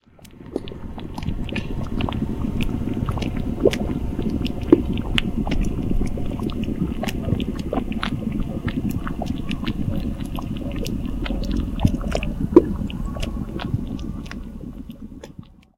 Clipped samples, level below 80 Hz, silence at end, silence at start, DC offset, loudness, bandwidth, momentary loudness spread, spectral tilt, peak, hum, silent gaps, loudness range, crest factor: under 0.1%; -30 dBFS; 0.35 s; 0.2 s; under 0.1%; -25 LUFS; 16.5 kHz; 14 LU; -7 dB/octave; 0 dBFS; none; none; 4 LU; 24 dB